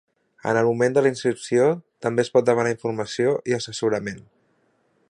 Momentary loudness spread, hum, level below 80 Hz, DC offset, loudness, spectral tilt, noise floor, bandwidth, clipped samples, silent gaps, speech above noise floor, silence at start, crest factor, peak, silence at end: 8 LU; none; -64 dBFS; under 0.1%; -22 LUFS; -5.5 dB/octave; -65 dBFS; 11 kHz; under 0.1%; none; 44 dB; 0.45 s; 18 dB; -4 dBFS; 0.9 s